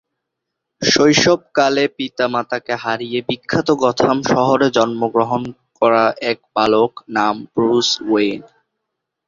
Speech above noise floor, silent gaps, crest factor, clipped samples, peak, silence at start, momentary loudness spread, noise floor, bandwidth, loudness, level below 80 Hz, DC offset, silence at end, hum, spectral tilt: 62 dB; none; 16 dB; under 0.1%; 0 dBFS; 0.8 s; 8 LU; -78 dBFS; 7.6 kHz; -16 LUFS; -54 dBFS; under 0.1%; 0.85 s; none; -4 dB/octave